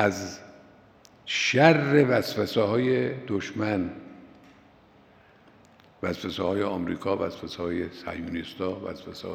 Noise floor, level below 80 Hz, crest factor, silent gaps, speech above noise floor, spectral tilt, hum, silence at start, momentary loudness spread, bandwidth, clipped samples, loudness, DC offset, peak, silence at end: -56 dBFS; -66 dBFS; 26 dB; none; 30 dB; -5.5 dB/octave; none; 0 s; 17 LU; 16 kHz; under 0.1%; -26 LUFS; under 0.1%; -2 dBFS; 0 s